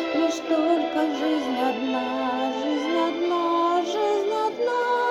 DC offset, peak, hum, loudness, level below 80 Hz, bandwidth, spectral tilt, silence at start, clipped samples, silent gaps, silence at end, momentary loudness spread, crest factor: under 0.1%; -10 dBFS; none; -24 LUFS; -68 dBFS; 12.5 kHz; -3.5 dB/octave; 0 s; under 0.1%; none; 0 s; 3 LU; 12 dB